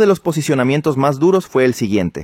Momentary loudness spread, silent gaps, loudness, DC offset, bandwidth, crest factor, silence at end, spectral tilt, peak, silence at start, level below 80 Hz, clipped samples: 3 LU; none; -16 LUFS; under 0.1%; 16 kHz; 12 dB; 0 s; -6.5 dB/octave; -2 dBFS; 0 s; -50 dBFS; under 0.1%